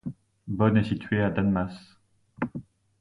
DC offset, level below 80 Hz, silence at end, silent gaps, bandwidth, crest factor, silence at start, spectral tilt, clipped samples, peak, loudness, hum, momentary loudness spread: under 0.1%; -50 dBFS; 0.4 s; none; 10 kHz; 20 dB; 0.05 s; -9 dB/octave; under 0.1%; -8 dBFS; -27 LUFS; none; 19 LU